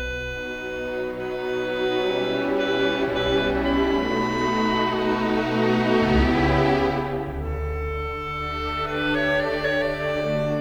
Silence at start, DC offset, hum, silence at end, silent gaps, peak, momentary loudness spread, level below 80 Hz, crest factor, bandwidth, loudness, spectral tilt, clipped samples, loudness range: 0 s; under 0.1%; none; 0 s; none; -8 dBFS; 9 LU; -36 dBFS; 14 dB; over 20 kHz; -23 LUFS; -6.5 dB/octave; under 0.1%; 4 LU